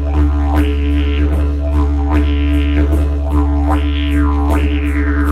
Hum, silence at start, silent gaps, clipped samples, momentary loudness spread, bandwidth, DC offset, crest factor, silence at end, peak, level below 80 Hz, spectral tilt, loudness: none; 0 s; none; under 0.1%; 2 LU; 4.3 kHz; under 0.1%; 12 dB; 0 s; -2 dBFS; -14 dBFS; -8 dB/octave; -15 LUFS